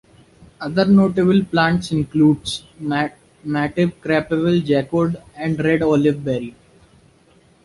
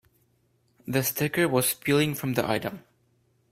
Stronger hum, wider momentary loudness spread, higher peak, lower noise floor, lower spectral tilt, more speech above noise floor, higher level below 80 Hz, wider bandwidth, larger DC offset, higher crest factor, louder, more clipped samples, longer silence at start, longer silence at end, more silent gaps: neither; about the same, 11 LU vs 12 LU; first, -2 dBFS vs -8 dBFS; second, -53 dBFS vs -68 dBFS; first, -7 dB/octave vs -4.5 dB/octave; second, 36 dB vs 42 dB; first, -48 dBFS vs -62 dBFS; second, 11.5 kHz vs 16 kHz; neither; about the same, 16 dB vs 20 dB; first, -18 LUFS vs -26 LUFS; neither; second, 0.6 s vs 0.85 s; first, 1.15 s vs 0.75 s; neither